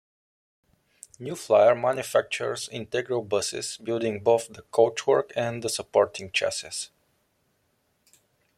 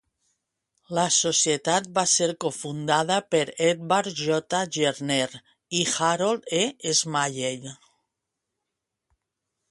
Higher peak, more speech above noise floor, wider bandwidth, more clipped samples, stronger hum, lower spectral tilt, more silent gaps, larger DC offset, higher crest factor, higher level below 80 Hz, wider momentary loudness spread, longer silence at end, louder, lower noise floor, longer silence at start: about the same, -6 dBFS vs -6 dBFS; second, 46 dB vs 59 dB; first, 15 kHz vs 11.5 kHz; neither; neither; about the same, -3.5 dB/octave vs -2.5 dB/octave; neither; neither; about the same, 20 dB vs 20 dB; about the same, -68 dBFS vs -68 dBFS; first, 12 LU vs 9 LU; second, 1.7 s vs 1.95 s; about the same, -25 LUFS vs -24 LUFS; second, -71 dBFS vs -84 dBFS; first, 1.2 s vs 0.9 s